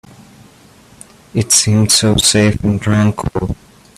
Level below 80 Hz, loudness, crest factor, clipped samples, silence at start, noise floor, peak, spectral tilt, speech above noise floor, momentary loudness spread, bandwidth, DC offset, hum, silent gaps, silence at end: -36 dBFS; -13 LUFS; 16 dB; under 0.1%; 1.35 s; -44 dBFS; 0 dBFS; -4 dB/octave; 31 dB; 12 LU; 15.5 kHz; under 0.1%; none; none; 0.45 s